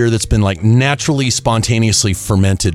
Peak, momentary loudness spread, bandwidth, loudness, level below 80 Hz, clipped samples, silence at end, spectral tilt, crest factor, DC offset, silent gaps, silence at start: -2 dBFS; 3 LU; 14.5 kHz; -13 LUFS; -28 dBFS; under 0.1%; 0 s; -4.5 dB/octave; 12 dB; under 0.1%; none; 0 s